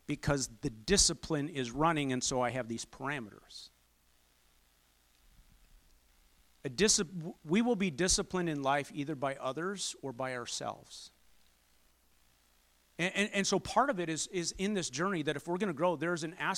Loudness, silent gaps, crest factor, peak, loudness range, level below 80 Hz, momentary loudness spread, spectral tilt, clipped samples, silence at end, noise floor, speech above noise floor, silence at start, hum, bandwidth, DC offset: -33 LUFS; none; 22 dB; -12 dBFS; 10 LU; -56 dBFS; 13 LU; -3.5 dB/octave; under 0.1%; 0 s; -69 dBFS; 36 dB; 0.1 s; none; 16.5 kHz; under 0.1%